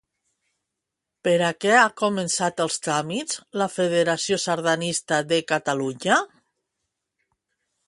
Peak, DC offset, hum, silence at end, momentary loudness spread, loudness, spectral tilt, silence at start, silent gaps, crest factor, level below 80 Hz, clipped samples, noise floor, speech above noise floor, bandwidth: -2 dBFS; under 0.1%; none; 1.65 s; 9 LU; -22 LUFS; -3.5 dB/octave; 1.25 s; none; 22 dB; -70 dBFS; under 0.1%; -84 dBFS; 61 dB; 11.5 kHz